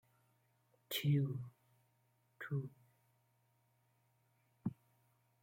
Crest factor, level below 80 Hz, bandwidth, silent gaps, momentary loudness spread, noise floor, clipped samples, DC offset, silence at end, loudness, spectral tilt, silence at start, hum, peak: 20 dB; -80 dBFS; 16.5 kHz; none; 18 LU; -78 dBFS; under 0.1%; under 0.1%; 0.7 s; -41 LUFS; -6 dB/octave; 0.9 s; none; -26 dBFS